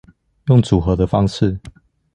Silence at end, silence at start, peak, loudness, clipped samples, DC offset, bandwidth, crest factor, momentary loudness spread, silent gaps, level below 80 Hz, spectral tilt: 0.45 s; 0.45 s; -2 dBFS; -16 LUFS; under 0.1%; under 0.1%; 9.2 kHz; 16 dB; 11 LU; none; -32 dBFS; -8 dB/octave